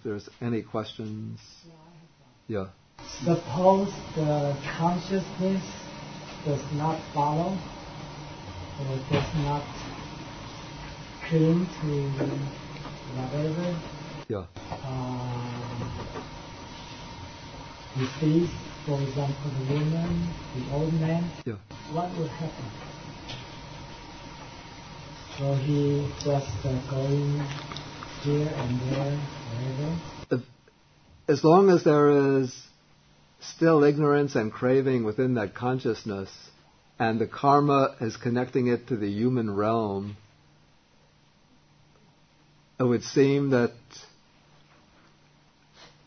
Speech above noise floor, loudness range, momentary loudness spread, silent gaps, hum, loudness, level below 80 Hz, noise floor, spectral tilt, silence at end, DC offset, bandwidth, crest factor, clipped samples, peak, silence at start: 34 dB; 11 LU; 19 LU; none; none; -27 LUFS; -52 dBFS; -61 dBFS; -7 dB/octave; 0.2 s; under 0.1%; 6.6 kHz; 22 dB; under 0.1%; -6 dBFS; 0.05 s